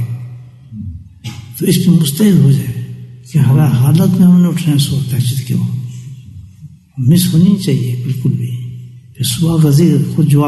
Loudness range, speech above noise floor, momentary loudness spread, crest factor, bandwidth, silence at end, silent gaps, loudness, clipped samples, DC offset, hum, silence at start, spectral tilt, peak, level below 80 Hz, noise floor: 4 LU; 26 dB; 20 LU; 12 dB; 12.5 kHz; 0 s; none; -12 LUFS; under 0.1%; under 0.1%; none; 0 s; -6.5 dB/octave; 0 dBFS; -44 dBFS; -37 dBFS